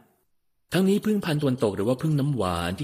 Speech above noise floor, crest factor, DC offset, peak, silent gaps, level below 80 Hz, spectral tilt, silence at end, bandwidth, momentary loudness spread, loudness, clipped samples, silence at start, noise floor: 45 dB; 16 dB; under 0.1%; -10 dBFS; none; -54 dBFS; -6.5 dB/octave; 0 s; 15.5 kHz; 4 LU; -25 LUFS; under 0.1%; 0.7 s; -69 dBFS